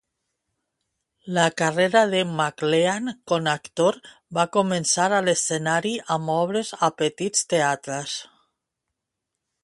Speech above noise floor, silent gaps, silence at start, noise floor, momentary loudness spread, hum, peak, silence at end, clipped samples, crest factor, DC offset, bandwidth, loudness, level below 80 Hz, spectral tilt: 60 dB; none; 1.25 s; -83 dBFS; 9 LU; none; -4 dBFS; 1.4 s; under 0.1%; 20 dB; under 0.1%; 11.5 kHz; -22 LUFS; -68 dBFS; -3.5 dB/octave